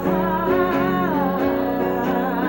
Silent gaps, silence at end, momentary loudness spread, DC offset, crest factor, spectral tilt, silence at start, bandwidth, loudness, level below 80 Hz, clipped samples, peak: none; 0 s; 2 LU; 0.2%; 12 dB; -8 dB/octave; 0 s; 17 kHz; -20 LUFS; -44 dBFS; under 0.1%; -8 dBFS